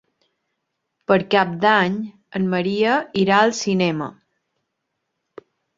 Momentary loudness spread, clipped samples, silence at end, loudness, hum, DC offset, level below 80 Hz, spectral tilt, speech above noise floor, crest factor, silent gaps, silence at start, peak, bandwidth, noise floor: 12 LU; under 0.1%; 1.65 s; -19 LUFS; none; under 0.1%; -62 dBFS; -5 dB/octave; 59 dB; 20 dB; none; 1.1 s; -2 dBFS; 7.8 kHz; -77 dBFS